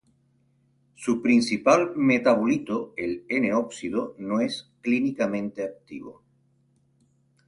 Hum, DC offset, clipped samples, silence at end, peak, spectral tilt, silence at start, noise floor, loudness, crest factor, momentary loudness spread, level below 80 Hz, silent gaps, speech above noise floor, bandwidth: none; under 0.1%; under 0.1%; 1.35 s; -6 dBFS; -5.5 dB/octave; 1 s; -66 dBFS; -25 LUFS; 20 dB; 13 LU; -66 dBFS; none; 41 dB; 11.5 kHz